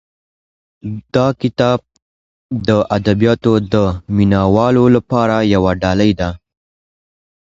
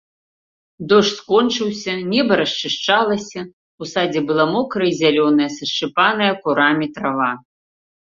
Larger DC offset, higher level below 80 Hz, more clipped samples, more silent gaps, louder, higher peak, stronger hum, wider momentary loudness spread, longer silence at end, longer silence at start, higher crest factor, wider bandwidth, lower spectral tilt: neither; first, -36 dBFS vs -60 dBFS; neither; first, 2.02-2.50 s vs 3.53-3.78 s; first, -14 LUFS vs -17 LUFS; about the same, 0 dBFS vs 0 dBFS; neither; about the same, 9 LU vs 9 LU; first, 1.2 s vs 0.6 s; about the same, 0.85 s vs 0.8 s; about the same, 16 dB vs 18 dB; about the same, 7.6 kHz vs 7.6 kHz; first, -7.5 dB/octave vs -4.5 dB/octave